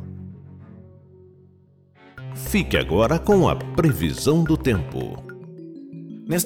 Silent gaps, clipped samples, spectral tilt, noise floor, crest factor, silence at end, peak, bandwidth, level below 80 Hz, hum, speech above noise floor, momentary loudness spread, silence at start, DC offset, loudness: none; under 0.1%; -6 dB/octave; -54 dBFS; 16 dB; 0 s; -8 dBFS; 17.5 kHz; -38 dBFS; none; 34 dB; 21 LU; 0 s; under 0.1%; -21 LUFS